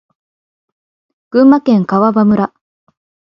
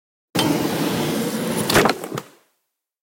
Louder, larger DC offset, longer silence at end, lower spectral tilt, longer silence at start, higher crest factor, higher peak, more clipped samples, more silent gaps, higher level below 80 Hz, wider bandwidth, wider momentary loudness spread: first, -11 LUFS vs -21 LUFS; neither; about the same, 0.8 s vs 0.75 s; first, -9.5 dB/octave vs -4 dB/octave; first, 1.35 s vs 0.35 s; second, 14 dB vs 20 dB; about the same, 0 dBFS vs -2 dBFS; neither; neither; about the same, -56 dBFS vs -52 dBFS; second, 6 kHz vs 17 kHz; second, 8 LU vs 12 LU